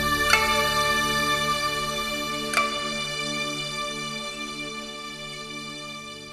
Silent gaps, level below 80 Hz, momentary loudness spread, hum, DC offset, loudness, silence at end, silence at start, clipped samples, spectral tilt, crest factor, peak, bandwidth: none; -46 dBFS; 15 LU; none; under 0.1%; -25 LUFS; 0 s; 0 s; under 0.1%; -2 dB/octave; 24 dB; -2 dBFS; 13 kHz